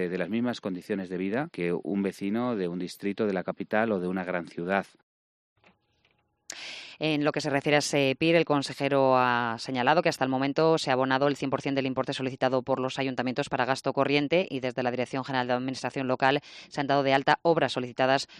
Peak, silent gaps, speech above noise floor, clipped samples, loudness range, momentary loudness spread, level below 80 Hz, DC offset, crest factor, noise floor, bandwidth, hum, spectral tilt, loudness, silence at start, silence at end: -8 dBFS; 5.03-5.56 s; 43 dB; under 0.1%; 7 LU; 9 LU; -68 dBFS; under 0.1%; 20 dB; -70 dBFS; 13 kHz; none; -5 dB/octave; -27 LUFS; 0 s; 0 s